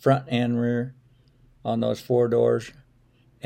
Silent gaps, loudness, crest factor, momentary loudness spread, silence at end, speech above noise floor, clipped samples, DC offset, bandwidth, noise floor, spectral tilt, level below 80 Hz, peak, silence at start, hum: none; -24 LUFS; 18 dB; 13 LU; 0.75 s; 36 dB; under 0.1%; under 0.1%; 16 kHz; -59 dBFS; -7.5 dB/octave; -62 dBFS; -8 dBFS; 0.05 s; none